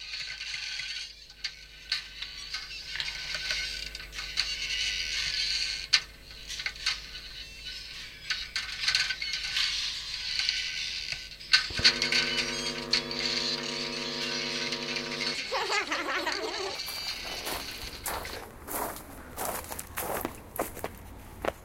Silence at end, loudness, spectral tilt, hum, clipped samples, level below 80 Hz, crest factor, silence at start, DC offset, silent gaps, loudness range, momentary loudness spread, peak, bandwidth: 0 s; -30 LUFS; -1 dB/octave; none; under 0.1%; -52 dBFS; 30 dB; 0 s; under 0.1%; none; 9 LU; 13 LU; -4 dBFS; 17 kHz